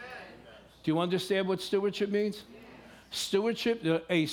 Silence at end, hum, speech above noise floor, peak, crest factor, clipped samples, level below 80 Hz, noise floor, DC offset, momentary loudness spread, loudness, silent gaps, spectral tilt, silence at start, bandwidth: 0 s; none; 24 dB; -14 dBFS; 18 dB; under 0.1%; -68 dBFS; -53 dBFS; under 0.1%; 19 LU; -30 LUFS; none; -5 dB/octave; 0 s; 17.5 kHz